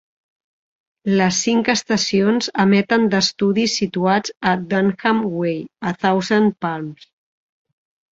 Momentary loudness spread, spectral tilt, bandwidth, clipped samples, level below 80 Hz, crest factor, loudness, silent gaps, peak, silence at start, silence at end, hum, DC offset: 9 LU; -4.5 dB/octave; 7.8 kHz; under 0.1%; -58 dBFS; 18 dB; -18 LUFS; none; -2 dBFS; 1.05 s; 1.05 s; none; under 0.1%